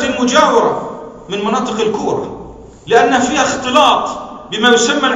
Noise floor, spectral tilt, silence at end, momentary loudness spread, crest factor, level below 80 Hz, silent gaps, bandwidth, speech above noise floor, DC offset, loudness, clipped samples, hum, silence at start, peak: -33 dBFS; -3 dB/octave; 0 s; 15 LU; 14 dB; -46 dBFS; none; 11 kHz; 21 dB; under 0.1%; -13 LUFS; 0.2%; none; 0 s; 0 dBFS